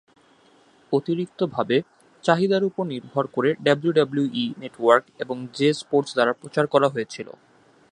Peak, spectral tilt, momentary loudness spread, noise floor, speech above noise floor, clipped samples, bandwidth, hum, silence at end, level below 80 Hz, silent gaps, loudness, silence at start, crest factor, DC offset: -2 dBFS; -6 dB/octave; 10 LU; -57 dBFS; 34 dB; under 0.1%; 10.5 kHz; none; 0.65 s; -72 dBFS; none; -23 LUFS; 0.9 s; 22 dB; under 0.1%